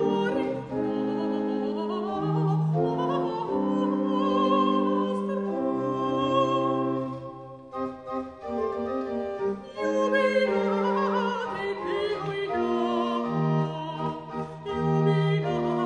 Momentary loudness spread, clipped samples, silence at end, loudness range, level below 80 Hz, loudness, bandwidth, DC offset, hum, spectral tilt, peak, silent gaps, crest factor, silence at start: 10 LU; under 0.1%; 0 s; 3 LU; -60 dBFS; -27 LUFS; 9.8 kHz; under 0.1%; none; -7.5 dB/octave; -12 dBFS; none; 14 dB; 0 s